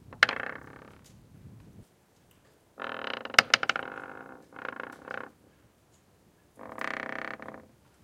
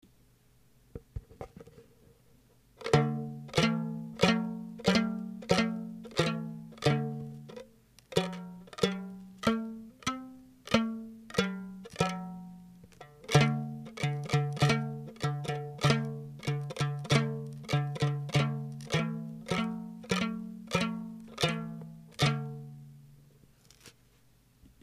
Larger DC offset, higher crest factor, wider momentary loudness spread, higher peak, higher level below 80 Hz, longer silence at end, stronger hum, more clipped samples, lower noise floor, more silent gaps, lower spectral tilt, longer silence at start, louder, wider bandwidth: neither; first, 34 dB vs 24 dB; first, 26 LU vs 18 LU; first, 0 dBFS vs -8 dBFS; second, -66 dBFS vs -58 dBFS; second, 0.4 s vs 0.9 s; neither; neither; about the same, -63 dBFS vs -64 dBFS; neither; second, -1 dB/octave vs -5.5 dB/octave; second, 0.1 s vs 0.95 s; about the same, -30 LUFS vs -32 LUFS; first, 16.5 kHz vs 14 kHz